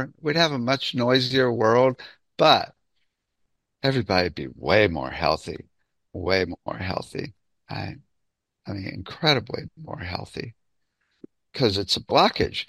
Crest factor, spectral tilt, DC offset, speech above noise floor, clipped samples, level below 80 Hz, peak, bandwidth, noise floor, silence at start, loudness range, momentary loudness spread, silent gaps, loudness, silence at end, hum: 24 dB; -5 dB/octave; under 0.1%; 55 dB; under 0.1%; -52 dBFS; -2 dBFS; 13 kHz; -78 dBFS; 0 s; 8 LU; 18 LU; none; -23 LUFS; 0.05 s; none